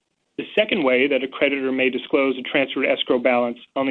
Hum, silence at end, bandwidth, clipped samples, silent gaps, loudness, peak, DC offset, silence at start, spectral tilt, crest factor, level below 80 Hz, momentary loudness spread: none; 0 s; 4.4 kHz; under 0.1%; none; -20 LUFS; -4 dBFS; under 0.1%; 0.4 s; -7 dB/octave; 16 dB; -66 dBFS; 6 LU